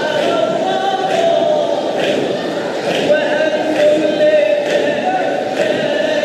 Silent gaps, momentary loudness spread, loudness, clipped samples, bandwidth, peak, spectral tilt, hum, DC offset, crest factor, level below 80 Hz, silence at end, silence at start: none; 5 LU; -15 LUFS; under 0.1%; 13 kHz; -2 dBFS; -4.5 dB/octave; none; under 0.1%; 14 dB; -64 dBFS; 0 s; 0 s